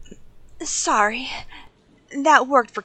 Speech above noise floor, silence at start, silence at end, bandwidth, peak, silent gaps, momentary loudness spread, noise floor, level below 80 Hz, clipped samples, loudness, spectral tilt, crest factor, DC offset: 30 dB; 0 s; 0.05 s; 9.4 kHz; 0 dBFS; none; 18 LU; -50 dBFS; -50 dBFS; under 0.1%; -19 LUFS; -1.5 dB/octave; 22 dB; under 0.1%